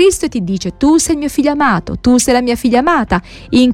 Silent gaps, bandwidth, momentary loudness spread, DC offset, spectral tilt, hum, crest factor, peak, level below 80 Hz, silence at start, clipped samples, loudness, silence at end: none; 15.5 kHz; 7 LU; under 0.1%; -4.5 dB/octave; none; 12 dB; 0 dBFS; -34 dBFS; 0 s; under 0.1%; -13 LUFS; 0 s